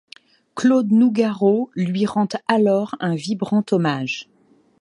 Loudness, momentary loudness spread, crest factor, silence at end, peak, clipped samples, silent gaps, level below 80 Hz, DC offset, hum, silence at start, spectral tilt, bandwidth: -19 LUFS; 8 LU; 16 dB; 0.55 s; -4 dBFS; under 0.1%; none; -66 dBFS; under 0.1%; none; 0.55 s; -6.5 dB/octave; 10.5 kHz